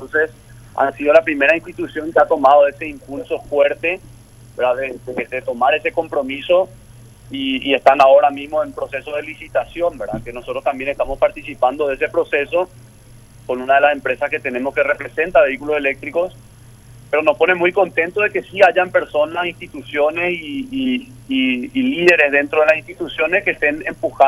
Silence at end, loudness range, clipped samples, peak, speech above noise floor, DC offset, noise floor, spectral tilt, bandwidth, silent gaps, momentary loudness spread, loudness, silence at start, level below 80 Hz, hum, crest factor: 0 s; 4 LU; under 0.1%; 0 dBFS; 26 dB; under 0.1%; -43 dBFS; -5 dB/octave; 12 kHz; none; 13 LU; -17 LUFS; 0 s; -46 dBFS; none; 18 dB